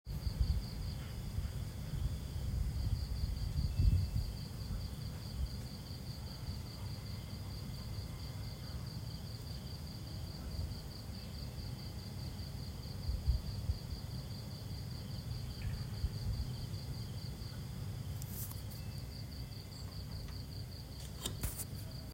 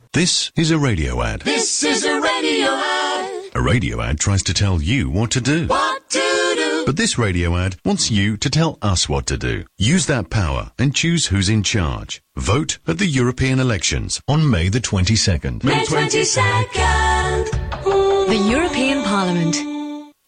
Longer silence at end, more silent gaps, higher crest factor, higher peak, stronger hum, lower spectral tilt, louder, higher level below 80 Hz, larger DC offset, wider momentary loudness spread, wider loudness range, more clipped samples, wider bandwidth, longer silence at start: second, 0 s vs 0.2 s; neither; first, 22 dB vs 12 dB; second, -18 dBFS vs -6 dBFS; neither; first, -5.5 dB/octave vs -4 dB/octave; second, -43 LUFS vs -18 LUFS; second, -44 dBFS vs -30 dBFS; neither; about the same, 7 LU vs 6 LU; first, 6 LU vs 2 LU; neither; first, 16 kHz vs 10.5 kHz; about the same, 0.05 s vs 0.15 s